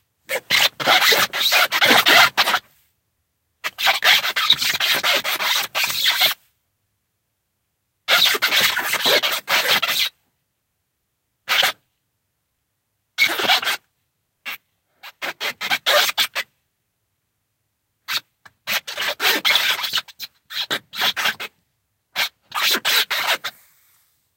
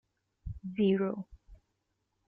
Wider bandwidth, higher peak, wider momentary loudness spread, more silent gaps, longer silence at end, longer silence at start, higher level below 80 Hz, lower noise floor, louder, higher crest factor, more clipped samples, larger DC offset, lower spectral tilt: first, 17 kHz vs 3.8 kHz; first, 0 dBFS vs -18 dBFS; second, 16 LU vs 21 LU; neither; first, 0.85 s vs 0.7 s; second, 0.3 s vs 0.45 s; second, -70 dBFS vs -54 dBFS; second, -74 dBFS vs -81 dBFS; first, -17 LUFS vs -32 LUFS; about the same, 22 dB vs 18 dB; neither; neither; second, 0.5 dB/octave vs -7 dB/octave